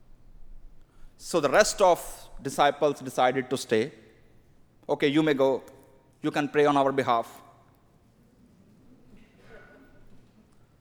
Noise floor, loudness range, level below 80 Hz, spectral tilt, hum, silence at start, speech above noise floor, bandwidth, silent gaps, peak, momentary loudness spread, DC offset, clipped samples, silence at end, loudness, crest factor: -60 dBFS; 4 LU; -54 dBFS; -4 dB/octave; none; 0.4 s; 36 dB; over 20 kHz; none; -6 dBFS; 13 LU; under 0.1%; under 0.1%; 1.2 s; -25 LUFS; 22 dB